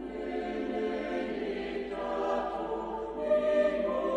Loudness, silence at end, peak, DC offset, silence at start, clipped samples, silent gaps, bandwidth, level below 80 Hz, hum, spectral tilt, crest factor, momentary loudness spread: -32 LUFS; 0 s; -18 dBFS; under 0.1%; 0 s; under 0.1%; none; 9 kHz; -56 dBFS; none; -6 dB/octave; 14 dB; 8 LU